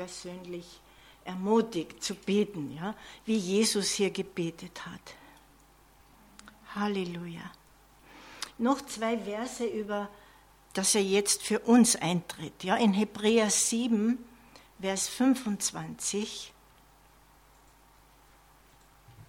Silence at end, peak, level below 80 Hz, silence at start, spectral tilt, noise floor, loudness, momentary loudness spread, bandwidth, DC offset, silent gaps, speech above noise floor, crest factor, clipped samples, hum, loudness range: 0.05 s; -12 dBFS; -64 dBFS; 0 s; -3.5 dB/octave; -59 dBFS; -29 LUFS; 18 LU; 16.5 kHz; under 0.1%; none; 30 dB; 20 dB; under 0.1%; none; 13 LU